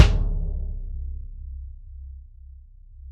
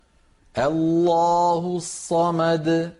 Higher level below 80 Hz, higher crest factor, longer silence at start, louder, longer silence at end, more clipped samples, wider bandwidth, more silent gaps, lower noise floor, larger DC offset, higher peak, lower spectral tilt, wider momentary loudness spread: first, -28 dBFS vs -54 dBFS; first, 24 dB vs 12 dB; second, 0 s vs 0.55 s; second, -29 LUFS vs -21 LUFS; about the same, 0 s vs 0.1 s; neither; second, 8.2 kHz vs 11.5 kHz; neither; second, -45 dBFS vs -58 dBFS; neither; first, 0 dBFS vs -10 dBFS; about the same, -6 dB/octave vs -6 dB/octave; first, 20 LU vs 8 LU